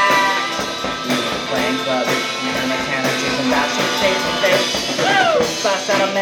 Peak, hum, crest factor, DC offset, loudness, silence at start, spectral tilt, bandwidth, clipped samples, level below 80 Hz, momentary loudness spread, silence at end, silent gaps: -2 dBFS; none; 16 dB; under 0.1%; -17 LUFS; 0 s; -2.5 dB/octave; 19 kHz; under 0.1%; -50 dBFS; 5 LU; 0 s; none